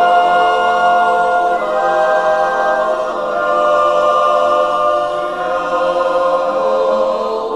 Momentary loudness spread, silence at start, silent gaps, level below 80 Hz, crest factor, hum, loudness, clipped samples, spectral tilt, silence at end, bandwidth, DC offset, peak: 5 LU; 0 s; none; -50 dBFS; 14 dB; none; -14 LUFS; under 0.1%; -3.5 dB/octave; 0 s; 11.5 kHz; 0.3%; 0 dBFS